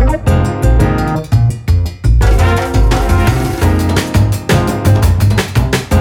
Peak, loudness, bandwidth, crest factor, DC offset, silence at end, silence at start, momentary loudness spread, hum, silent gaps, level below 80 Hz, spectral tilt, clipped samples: 0 dBFS; -12 LUFS; 17 kHz; 10 dB; under 0.1%; 0 s; 0 s; 3 LU; none; none; -16 dBFS; -6.5 dB/octave; under 0.1%